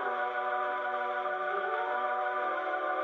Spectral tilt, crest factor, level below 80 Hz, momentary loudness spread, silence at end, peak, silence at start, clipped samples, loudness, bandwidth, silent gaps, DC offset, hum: -4 dB/octave; 12 dB; -86 dBFS; 1 LU; 0 s; -20 dBFS; 0 s; under 0.1%; -32 LUFS; 6.6 kHz; none; under 0.1%; none